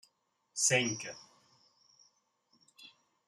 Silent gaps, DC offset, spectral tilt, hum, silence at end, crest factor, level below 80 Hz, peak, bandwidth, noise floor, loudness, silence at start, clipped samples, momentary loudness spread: none; under 0.1%; -2 dB/octave; none; 0.4 s; 24 dB; -82 dBFS; -14 dBFS; 13.5 kHz; -77 dBFS; -31 LUFS; 0.55 s; under 0.1%; 28 LU